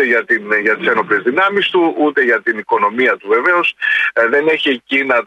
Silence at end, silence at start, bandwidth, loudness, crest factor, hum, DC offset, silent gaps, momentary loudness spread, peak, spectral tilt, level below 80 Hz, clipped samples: 0 s; 0 s; 9.4 kHz; -14 LUFS; 12 dB; none; under 0.1%; none; 3 LU; -2 dBFS; -5 dB/octave; -66 dBFS; under 0.1%